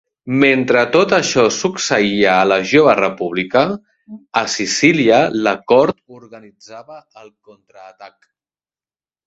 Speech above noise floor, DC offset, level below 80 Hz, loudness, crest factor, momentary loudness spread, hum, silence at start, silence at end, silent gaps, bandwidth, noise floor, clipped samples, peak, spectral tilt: over 74 dB; under 0.1%; -56 dBFS; -14 LUFS; 16 dB; 9 LU; none; 0.25 s; 1.2 s; none; 8 kHz; under -90 dBFS; under 0.1%; 0 dBFS; -4 dB/octave